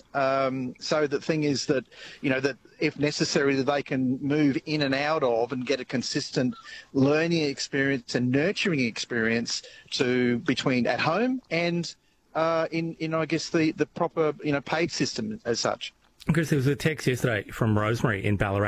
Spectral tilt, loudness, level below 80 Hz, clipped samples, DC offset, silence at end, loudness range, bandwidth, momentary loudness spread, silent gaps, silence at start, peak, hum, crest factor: -5 dB/octave; -26 LUFS; -54 dBFS; under 0.1%; under 0.1%; 0 s; 2 LU; 15 kHz; 6 LU; none; 0.15 s; -10 dBFS; none; 16 dB